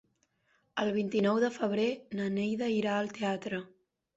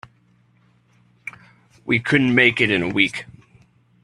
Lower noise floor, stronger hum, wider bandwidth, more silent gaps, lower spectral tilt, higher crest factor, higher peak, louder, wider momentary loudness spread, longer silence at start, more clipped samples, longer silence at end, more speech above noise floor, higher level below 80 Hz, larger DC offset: first, -74 dBFS vs -58 dBFS; second, none vs 60 Hz at -45 dBFS; second, 8 kHz vs 11.5 kHz; neither; about the same, -6 dB/octave vs -5.5 dB/octave; second, 16 dB vs 22 dB; second, -18 dBFS vs 0 dBFS; second, -32 LUFS vs -17 LUFS; second, 7 LU vs 22 LU; second, 0.75 s vs 1.25 s; neither; second, 0.5 s vs 0.8 s; about the same, 43 dB vs 40 dB; second, -72 dBFS vs -58 dBFS; neither